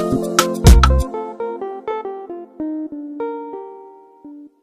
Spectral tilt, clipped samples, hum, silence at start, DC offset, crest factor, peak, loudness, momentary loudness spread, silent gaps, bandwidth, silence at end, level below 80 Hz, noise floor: -5.5 dB/octave; under 0.1%; none; 0 s; under 0.1%; 18 dB; 0 dBFS; -18 LUFS; 22 LU; none; 15.5 kHz; 0.15 s; -20 dBFS; -41 dBFS